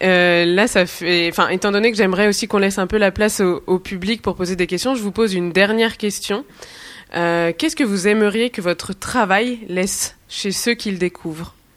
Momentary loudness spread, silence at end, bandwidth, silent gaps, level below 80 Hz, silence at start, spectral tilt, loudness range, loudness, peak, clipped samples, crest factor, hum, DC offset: 9 LU; 0.25 s; 15.5 kHz; none; -46 dBFS; 0 s; -4 dB/octave; 4 LU; -18 LUFS; 0 dBFS; under 0.1%; 18 dB; none; under 0.1%